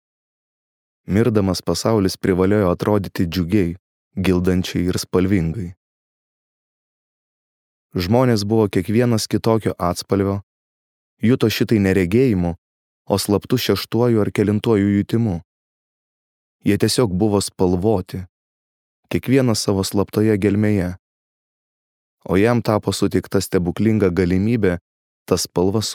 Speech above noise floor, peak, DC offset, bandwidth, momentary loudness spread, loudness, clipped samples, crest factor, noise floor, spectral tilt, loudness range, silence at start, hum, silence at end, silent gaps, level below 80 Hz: over 72 dB; 0 dBFS; under 0.1%; 18 kHz; 9 LU; -19 LUFS; under 0.1%; 18 dB; under -90 dBFS; -6 dB/octave; 3 LU; 1.1 s; none; 0 s; 3.79-4.11 s, 5.77-7.90 s, 10.43-11.17 s, 12.58-13.05 s, 15.45-16.59 s, 18.29-19.03 s, 20.99-22.18 s, 24.81-25.26 s; -46 dBFS